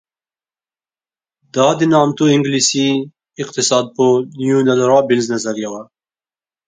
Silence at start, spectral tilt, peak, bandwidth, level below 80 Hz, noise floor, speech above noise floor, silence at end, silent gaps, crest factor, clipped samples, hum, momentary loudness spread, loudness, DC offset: 1.55 s; -4.5 dB/octave; 0 dBFS; 9.6 kHz; -62 dBFS; under -90 dBFS; over 76 dB; 0.85 s; none; 16 dB; under 0.1%; none; 12 LU; -15 LUFS; under 0.1%